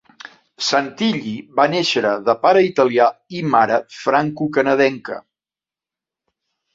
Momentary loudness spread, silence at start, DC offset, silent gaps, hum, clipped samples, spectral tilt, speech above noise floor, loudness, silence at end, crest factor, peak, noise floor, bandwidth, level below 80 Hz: 10 LU; 0.6 s; under 0.1%; none; none; under 0.1%; -4.5 dB/octave; over 73 dB; -17 LUFS; 1.55 s; 18 dB; -2 dBFS; under -90 dBFS; 7.8 kHz; -62 dBFS